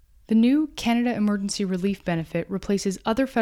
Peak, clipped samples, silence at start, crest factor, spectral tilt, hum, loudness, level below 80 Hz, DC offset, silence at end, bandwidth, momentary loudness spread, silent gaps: -10 dBFS; under 0.1%; 0.3 s; 14 dB; -5.5 dB/octave; none; -24 LUFS; -50 dBFS; under 0.1%; 0 s; 13.5 kHz; 7 LU; none